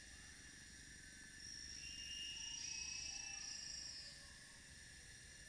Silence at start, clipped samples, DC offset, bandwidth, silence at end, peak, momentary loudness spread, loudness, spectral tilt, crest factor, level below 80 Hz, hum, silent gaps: 0 s; under 0.1%; under 0.1%; 11 kHz; 0 s; -36 dBFS; 12 LU; -50 LUFS; 0 dB/octave; 16 dB; -68 dBFS; none; none